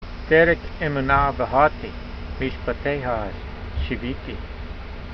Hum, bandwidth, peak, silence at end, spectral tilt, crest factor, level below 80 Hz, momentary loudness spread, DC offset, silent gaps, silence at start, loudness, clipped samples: none; 6.2 kHz; -2 dBFS; 0 s; -8 dB/octave; 20 dB; -34 dBFS; 17 LU; under 0.1%; none; 0 s; -22 LUFS; under 0.1%